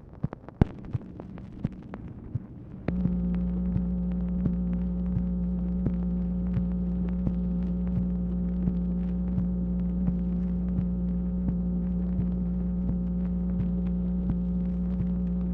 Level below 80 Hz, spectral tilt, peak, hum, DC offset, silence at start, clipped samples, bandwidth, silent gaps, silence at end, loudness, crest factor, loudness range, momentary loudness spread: -34 dBFS; -12 dB/octave; -8 dBFS; none; under 0.1%; 0 s; under 0.1%; 3.1 kHz; none; 0 s; -29 LUFS; 22 dB; 3 LU; 8 LU